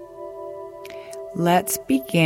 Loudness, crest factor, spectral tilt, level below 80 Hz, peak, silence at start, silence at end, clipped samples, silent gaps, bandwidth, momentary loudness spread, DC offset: -22 LUFS; 16 dB; -5 dB/octave; -58 dBFS; -8 dBFS; 0 s; 0 s; under 0.1%; none; 16.5 kHz; 17 LU; under 0.1%